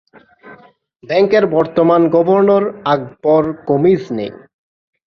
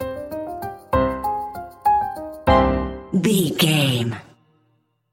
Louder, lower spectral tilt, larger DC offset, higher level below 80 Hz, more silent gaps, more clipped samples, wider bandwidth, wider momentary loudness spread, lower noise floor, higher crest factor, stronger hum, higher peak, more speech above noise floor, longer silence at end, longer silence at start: first, -14 LUFS vs -21 LUFS; first, -8.5 dB/octave vs -5 dB/octave; neither; second, -56 dBFS vs -36 dBFS; neither; neither; second, 6.6 kHz vs 16.5 kHz; second, 7 LU vs 13 LU; second, -45 dBFS vs -65 dBFS; about the same, 14 dB vs 18 dB; neither; about the same, -2 dBFS vs -4 dBFS; second, 32 dB vs 47 dB; second, 0.7 s vs 0.9 s; first, 0.45 s vs 0 s